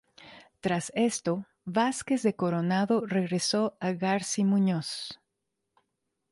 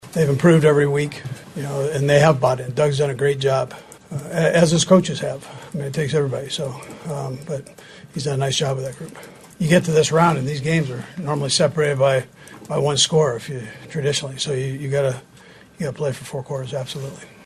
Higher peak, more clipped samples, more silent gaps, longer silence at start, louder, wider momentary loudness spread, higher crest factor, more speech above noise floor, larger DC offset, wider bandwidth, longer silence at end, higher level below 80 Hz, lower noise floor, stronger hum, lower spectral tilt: second, -14 dBFS vs 0 dBFS; neither; neither; first, 0.2 s vs 0.05 s; second, -28 LUFS vs -20 LUFS; second, 9 LU vs 16 LU; about the same, 16 dB vs 20 dB; first, 55 dB vs 26 dB; neither; second, 11.5 kHz vs 13 kHz; first, 1.15 s vs 0.2 s; second, -70 dBFS vs -54 dBFS; first, -83 dBFS vs -46 dBFS; neither; about the same, -5 dB/octave vs -5 dB/octave